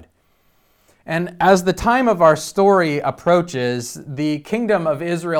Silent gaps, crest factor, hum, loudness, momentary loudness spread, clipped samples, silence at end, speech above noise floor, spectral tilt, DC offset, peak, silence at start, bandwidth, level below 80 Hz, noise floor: none; 18 dB; none; -17 LUFS; 9 LU; under 0.1%; 0 s; 43 dB; -5.5 dB/octave; under 0.1%; 0 dBFS; 1.05 s; 17.5 kHz; -46 dBFS; -60 dBFS